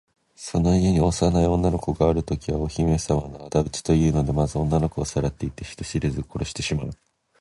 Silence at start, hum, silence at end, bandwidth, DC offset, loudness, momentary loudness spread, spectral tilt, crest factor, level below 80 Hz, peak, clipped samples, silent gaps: 0.4 s; none; 0.45 s; 11.5 kHz; under 0.1%; -23 LUFS; 10 LU; -6.5 dB/octave; 18 dB; -34 dBFS; -6 dBFS; under 0.1%; none